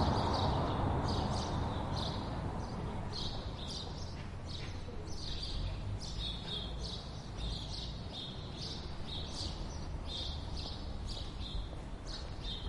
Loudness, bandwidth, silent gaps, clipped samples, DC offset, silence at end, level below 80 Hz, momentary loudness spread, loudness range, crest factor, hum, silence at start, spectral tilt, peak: -40 LUFS; 11.5 kHz; none; under 0.1%; under 0.1%; 0 s; -44 dBFS; 10 LU; 5 LU; 18 dB; none; 0 s; -5.5 dB/octave; -20 dBFS